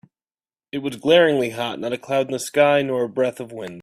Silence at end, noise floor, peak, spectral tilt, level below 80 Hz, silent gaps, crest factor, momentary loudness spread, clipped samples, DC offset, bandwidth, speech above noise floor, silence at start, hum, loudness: 0 s; under -90 dBFS; -2 dBFS; -4.5 dB/octave; -66 dBFS; none; 18 dB; 14 LU; under 0.1%; under 0.1%; 15 kHz; over 70 dB; 0.75 s; none; -20 LUFS